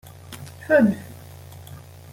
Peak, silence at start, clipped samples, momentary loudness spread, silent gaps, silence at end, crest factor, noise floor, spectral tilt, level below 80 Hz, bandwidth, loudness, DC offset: -6 dBFS; 0.3 s; under 0.1%; 24 LU; none; 0.35 s; 20 dB; -42 dBFS; -7 dB/octave; -60 dBFS; 17 kHz; -20 LUFS; under 0.1%